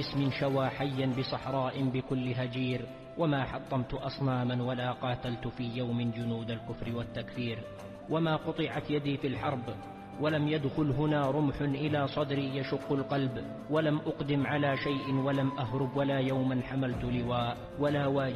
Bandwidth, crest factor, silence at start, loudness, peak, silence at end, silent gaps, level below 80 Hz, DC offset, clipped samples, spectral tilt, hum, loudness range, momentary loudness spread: 12 kHz; 14 dB; 0 s; -32 LUFS; -18 dBFS; 0 s; none; -54 dBFS; under 0.1%; under 0.1%; -8 dB/octave; none; 4 LU; 7 LU